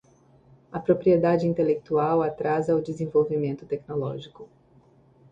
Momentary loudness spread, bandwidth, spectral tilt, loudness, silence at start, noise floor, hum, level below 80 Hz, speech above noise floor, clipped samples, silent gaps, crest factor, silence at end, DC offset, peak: 12 LU; 7.8 kHz; -9 dB/octave; -25 LUFS; 0.7 s; -57 dBFS; none; -60 dBFS; 33 dB; under 0.1%; none; 18 dB; 0.85 s; under 0.1%; -8 dBFS